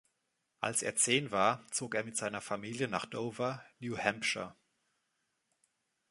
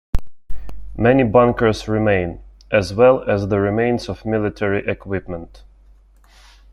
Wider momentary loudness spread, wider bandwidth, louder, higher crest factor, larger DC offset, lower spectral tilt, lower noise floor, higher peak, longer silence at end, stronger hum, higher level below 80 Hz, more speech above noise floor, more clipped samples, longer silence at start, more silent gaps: second, 11 LU vs 18 LU; about the same, 12 kHz vs 11.5 kHz; second, -34 LUFS vs -18 LUFS; first, 26 dB vs 16 dB; neither; second, -2.5 dB/octave vs -7.5 dB/octave; first, -82 dBFS vs -49 dBFS; second, -12 dBFS vs -2 dBFS; first, 1.6 s vs 1.15 s; neither; second, -74 dBFS vs -36 dBFS; first, 47 dB vs 32 dB; neither; first, 0.6 s vs 0.15 s; neither